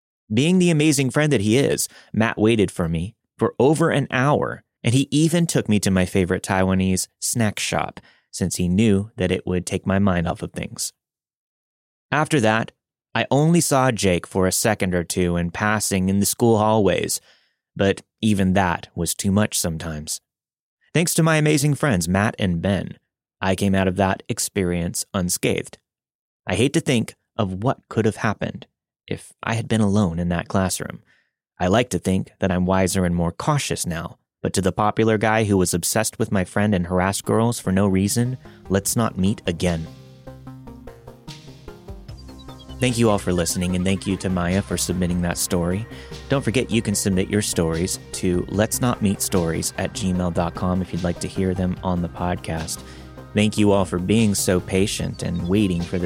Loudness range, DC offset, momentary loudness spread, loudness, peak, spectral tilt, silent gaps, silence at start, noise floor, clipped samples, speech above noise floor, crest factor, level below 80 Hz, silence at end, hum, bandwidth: 4 LU; under 0.1%; 11 LU; -21 LUFS; -4 dBFS; -5 dB/octave; 11.35-12.09 s, 20.60-20.77 s, 26.15-26.43 s; 0.3 s; -63 dBFS; under 0.1%; 43 dB; 18 dB; -46 dBFS; 0 s; none; 16.5 kHz